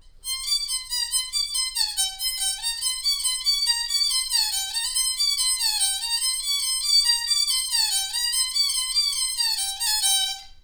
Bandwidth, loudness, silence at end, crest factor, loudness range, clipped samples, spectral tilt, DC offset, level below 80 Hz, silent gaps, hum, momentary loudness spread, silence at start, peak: over 20 kHz; -21 LUFS; 0.05 s; 16 dB; 2 LU; under 0.1%; 5 dB/octave; under 0.1%; -50 dBFS; none; none; 5 LU; 0.05 s; -8 dBFS